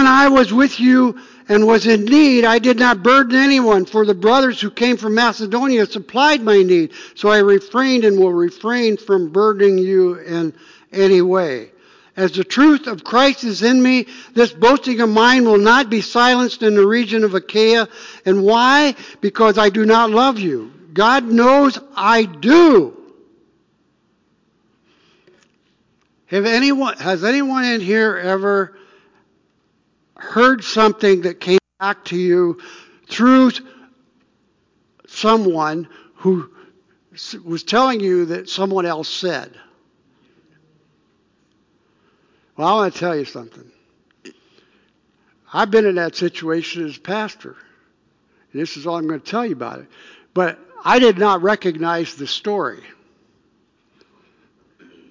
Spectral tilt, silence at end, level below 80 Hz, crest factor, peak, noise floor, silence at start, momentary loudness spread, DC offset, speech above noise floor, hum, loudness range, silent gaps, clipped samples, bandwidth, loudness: -5 dB/octave; 2.35 s; -58 dBFS; 14 dB; -2 dBFS; -63 dBFS; 0 s; 13 LU; under 0.1%; 48 dB; none; 11 LU; none; under 0.1%; 7.6 kHz; -15 LUFS